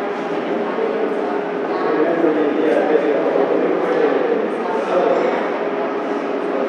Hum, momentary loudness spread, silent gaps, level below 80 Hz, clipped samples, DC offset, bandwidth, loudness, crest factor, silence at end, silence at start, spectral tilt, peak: none; 5 LU; none; -82 dBFS; under 0.1%; under 0.1%; 9.2 kHz; -18 LUFS; 16 dB; 0 s; 0 s; -6.5 dB/octave; -2 dBFS